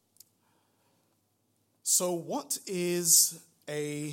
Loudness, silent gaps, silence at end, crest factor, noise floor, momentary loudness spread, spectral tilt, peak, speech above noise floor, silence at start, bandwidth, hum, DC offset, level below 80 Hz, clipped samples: -27 LUFS; none; 0 s; 24 dB; -74 dBFS; 15 LU; -2 dB/octave; -8 dBFS; 45 dB; 1.85 s; 16.5 kHz; none; under 0.1%; -84 dBFS; under 0.1%